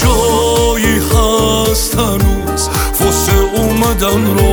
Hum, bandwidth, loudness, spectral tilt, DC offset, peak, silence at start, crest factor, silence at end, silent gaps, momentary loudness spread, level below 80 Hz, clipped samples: none; over 20 kHz; -12 LUFS; -4.5 dB/octave; under 0.1%; 0 dBFS; 0 s; 12 dB; 0 s; none; 3 LU; -18 dBFS; under 0.1%